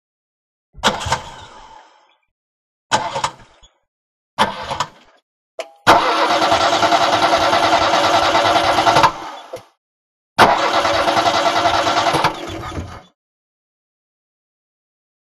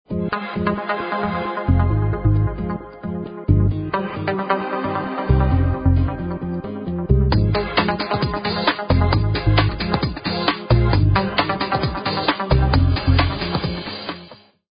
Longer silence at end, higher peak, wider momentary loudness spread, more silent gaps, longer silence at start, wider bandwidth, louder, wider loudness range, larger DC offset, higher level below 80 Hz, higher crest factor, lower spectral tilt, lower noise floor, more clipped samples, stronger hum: first, 2.4 s vs 0.45 s; about the same, 0 dBFS vs -2 dBFS; first, 18 LU vs 10 LU; first, 2.31-2.90 s, 3.88-4.37 s, 5.22-5.58 s, 9.78-10.36 s vs none; first, 0.75 s vs 0.1 s; first, 15 kHz vs 5.2 kHz; first, -15 LUFS vs -20 LUFS; first, 11 LU vs 3 LU; neither; second, -46 dBFS vs -26 dBFS; about the same, 18 dB vs 18 dB; second, -3 dB/octave vs -11.5 dB/octave; first, -52 dBFS vs -44 dBFS; neither; neither